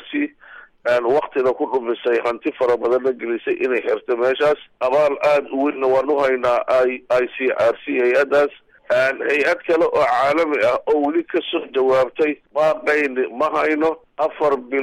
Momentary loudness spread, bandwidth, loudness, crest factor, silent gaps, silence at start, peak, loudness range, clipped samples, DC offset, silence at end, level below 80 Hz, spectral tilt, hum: 5 LU; 12 kHz; -19 LUFS; 12 dB; none; 0 s; -8 dBFS; 2 LU; under 0.1%; under 0.1%; 0 s; -58 dBFS; -5 dB/octave; none